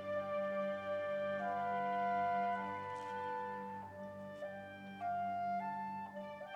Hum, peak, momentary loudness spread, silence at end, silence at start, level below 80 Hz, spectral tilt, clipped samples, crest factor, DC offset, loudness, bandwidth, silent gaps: 50 Hz at -75 dBFS; -28 dBFS; 12 LU; 0 s; 0 s; -82 dBFS; -6.5 dB/octave; under 0.1%; 12 dB; under 0.1%; -41 LUFS; 10.5 kHz; none